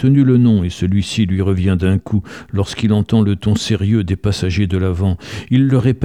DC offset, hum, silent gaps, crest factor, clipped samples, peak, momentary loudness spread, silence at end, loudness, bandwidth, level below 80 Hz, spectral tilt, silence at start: 0.3%; none; none; 12 dB; under 0.1%; -2 dBFS; 8 LU; 0 s; -16 LUFS; 11 kHz; -36 dBFS; -7 dB/octave; 0 s